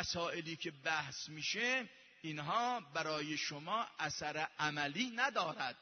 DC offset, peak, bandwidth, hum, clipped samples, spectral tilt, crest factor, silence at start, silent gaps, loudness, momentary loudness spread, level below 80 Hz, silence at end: under 0.1%; -20 dBFS; 6.4 kHz; none; under 0.1%; -1.5 dB/octave; 20 dB; 0 s; none; -39 LUFS; 8 LU; -74 dBFS; 0.05 s